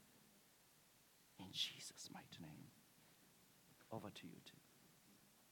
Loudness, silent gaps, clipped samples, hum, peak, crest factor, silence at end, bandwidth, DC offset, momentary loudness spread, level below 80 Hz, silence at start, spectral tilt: -52 LUFS; none; under 0.1%; none; -30 dBFS; 28 dB; 0 s; 18 kHz; under 0.1%; 24 LU; under -90 dBFS; 0 s; -2.5 dB/octave